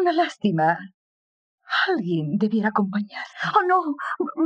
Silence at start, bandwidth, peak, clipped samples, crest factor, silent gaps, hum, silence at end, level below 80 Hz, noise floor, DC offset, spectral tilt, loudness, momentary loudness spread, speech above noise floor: 0 s; 8.6 kHz; -6 dBFS; under 0.1%; 18 dB; 0.94-1.58 s; none; 0 s; -74 dBFS; under -90 dBFS; under 0.1%; -6.5 dB/octave; -23 LUFS; 8 LU; over 68 dB